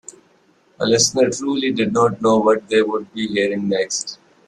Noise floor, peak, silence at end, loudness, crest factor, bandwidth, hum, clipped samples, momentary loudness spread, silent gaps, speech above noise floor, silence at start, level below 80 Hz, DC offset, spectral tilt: -57 dBFS; -2 dBFS; 0.35 s; -18 LUFS; 16 dB; 12.5 kHz; none; under 0.1%; 8 LU; none; 39 dB; 0.8 s; -60 dBFS; under 0.1%; -3.5 dB/octave